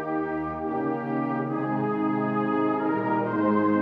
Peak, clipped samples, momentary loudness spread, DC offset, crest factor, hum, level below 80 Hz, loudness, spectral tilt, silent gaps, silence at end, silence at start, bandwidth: -12 dBFS; under 0.1%; 5 LU; under 0.1%; 14 dB; none; -60 dBFS; -26 LUFS; -10 dB/octave; none; 0 s; 0 s; 4.8 kHz